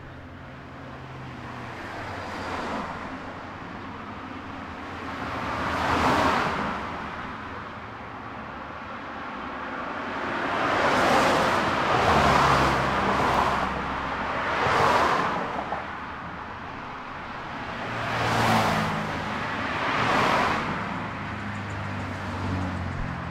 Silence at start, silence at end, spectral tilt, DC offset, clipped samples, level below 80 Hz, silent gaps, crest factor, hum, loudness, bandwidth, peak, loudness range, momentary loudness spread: 0 s; 0 s; -5 dB/octave; under 0.1%; under 0.1%; -46 dBFS; none; 20 dB; none; -26 LUFS; 16 kHz; -8 dBFS; 13 LU; 16 LU